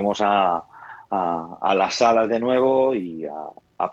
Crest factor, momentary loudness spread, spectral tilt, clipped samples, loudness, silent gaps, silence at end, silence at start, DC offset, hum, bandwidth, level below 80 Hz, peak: 18 dB; 16 LU; -4.5 dB/octave; under 0.1%; -21 LUFS; none; 0 s; 0 s; under 0.1%; none; 8 kHz; -62 dBFS; -4 dBFS